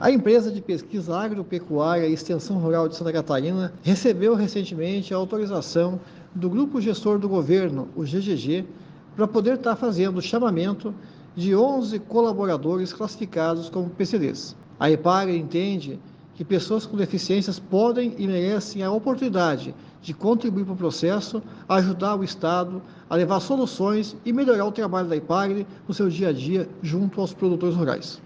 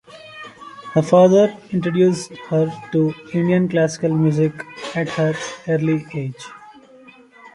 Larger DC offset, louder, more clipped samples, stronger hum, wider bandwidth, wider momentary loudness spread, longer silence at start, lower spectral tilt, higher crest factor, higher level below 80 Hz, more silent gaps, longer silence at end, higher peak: neither; second, -24 LUFS vs -19 LUFS; neither; neither; second, 7.8 kHz vs 11.5 kHz; second, 9 LU vs 22 LU; second, 0 s vs 0.15 s; about the same, -7 dB/octave vs -7 dB/octave; about the same, 18 dB vs 18 dB; second, -66 dBFS vs -60 dBFS; neither; about the same, 0.05 s vs 0.05 s; second, -6 dBFS vs -2 dBFS